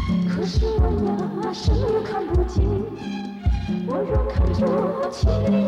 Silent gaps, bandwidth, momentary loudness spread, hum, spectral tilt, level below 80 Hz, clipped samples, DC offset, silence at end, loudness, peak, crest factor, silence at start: none; 8.4 kHz; 5 LU; none; -8 dB/octave; -26 dBFS; under 0.1%; under 0.1%; 0 s; -23 LUFS; -8 dBFS; 14 dB; 0 s